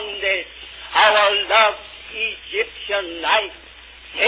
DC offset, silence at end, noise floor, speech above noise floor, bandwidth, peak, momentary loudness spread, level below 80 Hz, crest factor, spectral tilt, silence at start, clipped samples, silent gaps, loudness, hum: under 0.1%; 0 s; -41 dBFS; 23 dB; 4 kHz; -2 dBFS; 18 LU; -52 dBFS; 18 dB; -4.5 dB/octave; 0 s; under 0.1%; none; -18 LUFS; none